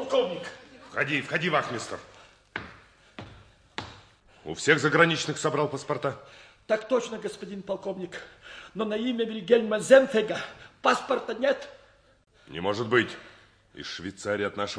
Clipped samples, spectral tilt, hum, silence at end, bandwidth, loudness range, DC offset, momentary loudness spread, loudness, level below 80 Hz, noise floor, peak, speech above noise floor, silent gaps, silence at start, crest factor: under 0.1%; -4.5 dB/octave; none; 0 s; 10.5 kHz; 7 LU; under 0.1%; 20 LU; -26 LUFS; -64 dBFS; -55 dBFS; -6 dBFS; 28 dB; none; 0 s; 22 dB